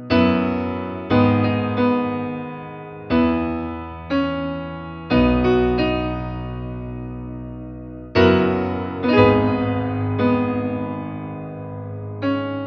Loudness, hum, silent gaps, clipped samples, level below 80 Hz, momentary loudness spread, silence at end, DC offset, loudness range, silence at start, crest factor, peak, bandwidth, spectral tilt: -20 LUFS; none; none; under 0.1%; -38 dBFS; 16 LU; 0 s; under 0.1%; 4 LU; 0 s; 20 dB; -2 dBFS; 6.2 kHz; -9 dB/octave